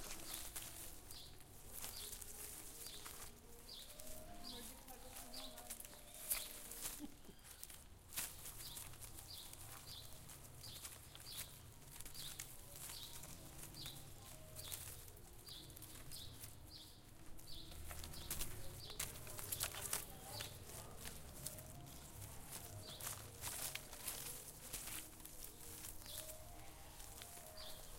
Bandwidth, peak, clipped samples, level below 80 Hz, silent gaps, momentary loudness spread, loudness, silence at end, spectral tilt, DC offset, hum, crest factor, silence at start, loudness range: 17 kHz; -20 dBFS; under 0.1%; -62 dBFS; none; 10 LU; -50 LUFS; 0 s; -2 dB/octave; under 0.1%; none; 30 dB; 0 s; 6 LU